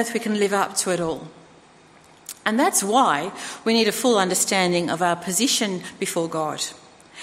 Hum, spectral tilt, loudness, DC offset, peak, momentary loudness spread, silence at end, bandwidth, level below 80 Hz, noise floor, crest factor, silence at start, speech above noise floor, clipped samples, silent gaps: none; -3 dB/octave; -21 LUFS; under 0.1%; -4 dBFS; 10 LU; 0 s; 16 kHz; -64 dBFS; -51 dBFS; 18 dB; 0 s; 29 dB; under 0.1%; none